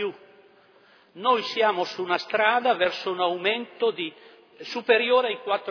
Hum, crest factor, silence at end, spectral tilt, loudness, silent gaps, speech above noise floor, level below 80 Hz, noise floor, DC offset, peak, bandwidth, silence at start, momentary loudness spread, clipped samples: none; 18 dB; 0 s; -4 dB/octave; -24 LUFS; none; 33 dB; -74 dBFS; -57 dBFS; under 0.1%; -6 dBFS; 5.4 kHz; 0 s; 12 LU; under 0.1%